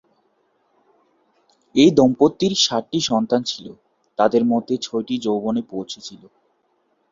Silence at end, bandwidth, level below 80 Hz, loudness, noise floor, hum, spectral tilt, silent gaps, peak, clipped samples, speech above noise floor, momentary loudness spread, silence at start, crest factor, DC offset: 0.95 s; 7.6 kHz; -58 dBFS; -19 LUFS; -66 dBFS; none; -4.5 dB/octave; none; -2 dBFS; under 0.1%; 47 dB; 17 LU; 1.75 s; 20 dB; under 0.1%